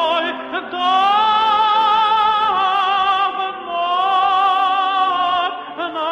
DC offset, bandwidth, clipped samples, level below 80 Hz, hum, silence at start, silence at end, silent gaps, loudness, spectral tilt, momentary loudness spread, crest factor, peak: under 0.1%; 9 kHz; under 0.1%; -58 dBFS; none; 0 s; 0 s; none; -16 LUFS; -3 dB/octave; 9 LU; 10 dB; -6 dBFS